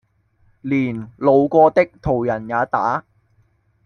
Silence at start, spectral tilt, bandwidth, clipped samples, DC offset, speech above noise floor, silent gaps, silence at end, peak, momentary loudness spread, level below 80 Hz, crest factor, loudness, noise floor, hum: 0.65 s; -9 dB/octave; 6.6 kHz; under 0.1%; under 0.1%; 43 dB; none; 0.85 s; -2 dBFS; 10 LU; -48 dBFS; 18 dB; -18 LUFS; -60 dBFS; none